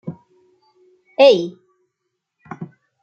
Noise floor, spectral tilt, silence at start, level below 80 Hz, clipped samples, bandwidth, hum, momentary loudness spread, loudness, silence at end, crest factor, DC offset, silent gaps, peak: -77 dBFS; -5.5 dB/octave; 0.05 s; -72 dBFS; under 0.1%; 7 kHz; none; 25 LU; -14 LUFS; 0.35 s; 20 dB; under 0.1%; none; -2 dBFS